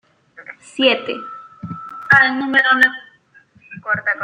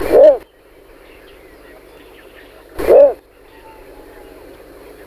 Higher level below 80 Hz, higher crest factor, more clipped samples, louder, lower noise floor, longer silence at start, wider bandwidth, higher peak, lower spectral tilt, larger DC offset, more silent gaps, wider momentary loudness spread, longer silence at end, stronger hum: second, -64 dBFS vs -42 dBFS; about the same, 18 dB vs 16 dB; neither; second, -15 LUFS vs -11 LUFS; first, -52 dBFS vs -45 dBFS; first, 0.4 s vs 0 s; about the same, 16 kHz vs 15.5 kHz; about the same, -2 dBFS vs 0 dBFS; second, -4.5 dB/octave vs -6 dB/octave; neither; neither; about the same, 22 LU vs 22 LU; second, 0 s vs 1.9 s; second, none vs 50 Hz at -55 dBFS